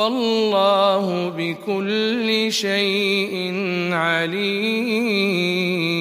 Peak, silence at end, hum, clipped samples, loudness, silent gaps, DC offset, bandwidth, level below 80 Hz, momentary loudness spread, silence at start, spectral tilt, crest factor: -6 dBFS; 0 s; none; under 0.1%; -20 LUFS; none; under 0.1%; 15.5 kHz; -72 dBFS; 6 LU; 0 s; -4.5 dB/octave; 14 dB